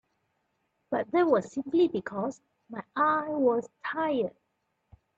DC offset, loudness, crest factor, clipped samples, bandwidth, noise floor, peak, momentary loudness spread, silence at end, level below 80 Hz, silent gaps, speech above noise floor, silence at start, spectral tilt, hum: under 0.1%; -28 LUFS; 18 dB; under 0.1%; 7.8 kHz; -78 dBFS; -12 dBFS; 10 LU; 0.9 s; -72 dBFS; none; 50 dB; 0.9 s; -6.5 dB/octave; none